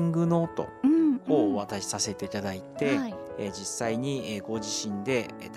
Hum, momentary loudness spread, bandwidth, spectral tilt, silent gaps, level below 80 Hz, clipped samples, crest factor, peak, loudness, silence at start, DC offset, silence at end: none; 10 LU; 14 kHz; -5 dB/octave; none; -64 dBFS; under 0.1%; 18 dB; -10 dBFS; -28 LUFS; 0 s; under 0.1%; 0 s